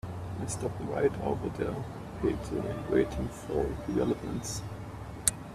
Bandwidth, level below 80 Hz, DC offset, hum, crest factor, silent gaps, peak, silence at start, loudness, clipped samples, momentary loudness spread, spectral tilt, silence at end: 14.5 kHz; -46 dBFS; under 0.1%; none; 28 dB; none; -4 dBFS; 0.05 s; -33 LUFS; under 0.1%; 9 LU; -5 dB/octave; 0 s